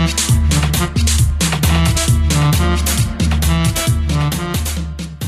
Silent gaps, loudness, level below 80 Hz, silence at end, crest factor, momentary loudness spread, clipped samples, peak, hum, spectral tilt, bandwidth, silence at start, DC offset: none; -15 LUFS; -20 dBFS; 0 s; 12 dB; 6 LU; under 0.1%; -2 dBFS; none; -4.5 dB/octave; 15 kHz; 0 s; under 0.1%